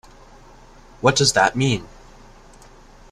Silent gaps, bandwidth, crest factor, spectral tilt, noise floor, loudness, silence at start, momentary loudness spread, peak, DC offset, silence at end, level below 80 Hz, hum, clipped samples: none; 13.5 kHz; 22 dB; -3.5 dB/octave; -46 dBFS; -18 LUFS; 1 s; 6 LU; -2 dBFS; under 0.1%; 1.25 s; -46 dBFS; none; under 0.1%